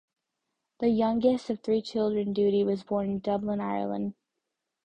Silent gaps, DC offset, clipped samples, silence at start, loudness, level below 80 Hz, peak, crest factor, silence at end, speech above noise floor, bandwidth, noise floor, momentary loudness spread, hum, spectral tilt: none; under 0.1%; under 0.1%; 0.8 s; -28 LUFS; -62 dBFS; -12 dBFS; 16 dB; 0.75 s; 57 dB; 9 kHz; -84 dBFS; 6 LU; none; -8 dB/octave